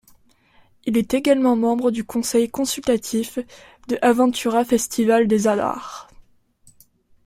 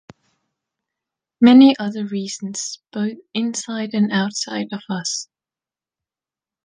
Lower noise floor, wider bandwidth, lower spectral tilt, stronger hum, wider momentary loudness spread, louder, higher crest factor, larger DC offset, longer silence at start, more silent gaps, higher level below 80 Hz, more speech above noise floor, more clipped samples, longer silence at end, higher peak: second, -57 dBFS vs under -90 dBFS; first, 16 kHz vs 9.8 kHz; about the same, -4.5 dB/octave vs -4.5 dB/octave; neither; about the same, 14 LU vs 16 LU; about the same, -20 LUFS vs -19 LUFS; about the same, 18 dB vs 18 dB; neither; second, 0.85 s vs 1.4 s; neither; first, -54 dBFS vs -68 dBFS; second, 37 dB vs over 72 dB; neither; second, 1.25 s vs 1.45 s; about the same, -4 dBFS vs -2 dBFS